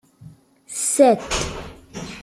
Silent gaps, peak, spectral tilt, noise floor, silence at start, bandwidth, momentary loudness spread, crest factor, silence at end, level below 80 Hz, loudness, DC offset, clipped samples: none; -2 dBFS; -3.5 dB/octave; -46 dBFS; 0.2 s; 16 kHz; 20 LU; 20 dB; 0 s; -42 dBFS; -19 LUFS; under 0.1%; under 0.1%